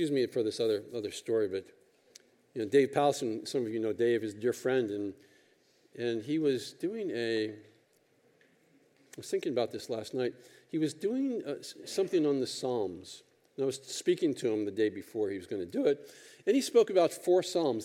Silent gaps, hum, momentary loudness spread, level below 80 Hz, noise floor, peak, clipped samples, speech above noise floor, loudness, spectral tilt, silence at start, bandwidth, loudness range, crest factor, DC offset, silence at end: none; none; 11 LU; -86 dBFS; -68 dBFS; -12 dBFS; under 0.1%; 37 dB; -32 LUFS; -5 dB/octave; 0 s; 16 kHz; 6 LU; 20 dB; under 0.1%; 0 s